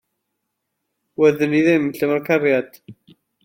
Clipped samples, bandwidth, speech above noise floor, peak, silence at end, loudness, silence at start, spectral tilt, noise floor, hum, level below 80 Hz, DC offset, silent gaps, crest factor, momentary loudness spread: under 0.1%; 16.5 kHz; 59 dB; -4 dBFS; 0.5 s; -18 LUFS; 1.2 s; -7 dB/octave; -77 dBFS; none; -66 dBFS; under 0.1%; none; 16 dB; 9 LU